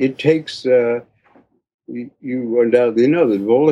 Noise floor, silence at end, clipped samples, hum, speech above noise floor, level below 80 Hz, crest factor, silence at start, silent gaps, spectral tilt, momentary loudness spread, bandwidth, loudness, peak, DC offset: -54 dBFS; 0 s; under 0.1%; none; 38 dB; -66 dBFS; 16 dB; 0 s; 1.74-1.79 s; -7 dB/octave; 16 LU; 9.4 kHz; -16 LUFS; -2 dBFS; under 0.1%